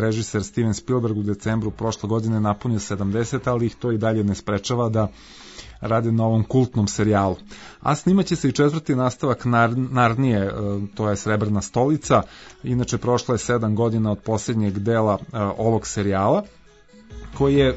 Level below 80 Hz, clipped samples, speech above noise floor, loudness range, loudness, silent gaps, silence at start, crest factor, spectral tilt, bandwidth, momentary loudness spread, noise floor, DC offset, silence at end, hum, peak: -46 dBFS; under 0.1%; 28 dB; 3 LU; -22 LUFS; none; 0 s; 16 dB; -6.5 dB/octave; 8 kHz; 7 LU; -49 dBFS; under 0.1%; 0 s; none; -4 dBFS